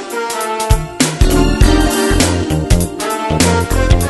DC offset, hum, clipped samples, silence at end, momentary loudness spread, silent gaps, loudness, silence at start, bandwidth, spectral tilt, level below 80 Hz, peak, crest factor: under 0.1%; none; 0.2%; 0 s; 6 LU; none; -14 LUFS; 0 s; 12.5 kHz; -4.5 dB/octave; -18 dBFS; 0 dBFS; 12 dB